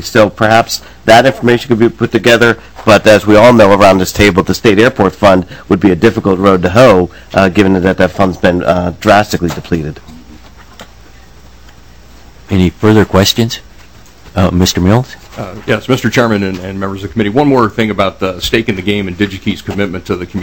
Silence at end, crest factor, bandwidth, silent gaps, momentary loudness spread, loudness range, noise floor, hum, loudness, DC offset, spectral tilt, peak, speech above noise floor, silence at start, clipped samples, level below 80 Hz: 0 s; 10 dB; over 20 kHz; none; 11 LU; 8 LU; -38 dBFS; none; -10 LUFS; 1%; -5.5 dB/octave; 0 dBFS; 29 dB; 0 s; 4%; -34 dBFS